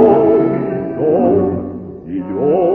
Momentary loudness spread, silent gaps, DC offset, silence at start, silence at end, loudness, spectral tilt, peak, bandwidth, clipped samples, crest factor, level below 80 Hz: 14 LU; none; under 0.1%; 0 s; 0 s; -15 LUFS; -11.5 dB/octave; 0 dBFS; 3.4 kHz; under 0.1%; 14 dB; -46 dBFS